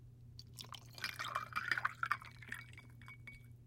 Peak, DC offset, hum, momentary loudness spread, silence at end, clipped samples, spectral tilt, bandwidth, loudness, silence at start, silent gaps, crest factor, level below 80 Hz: -18 dBFS; under 0.1%; none; 18 LU; 0 s; under 0.1%; -2.5 dB/octave; 16.5 kHz; -42 LUFS; 0 s; none; 26 dB; -70 dBFS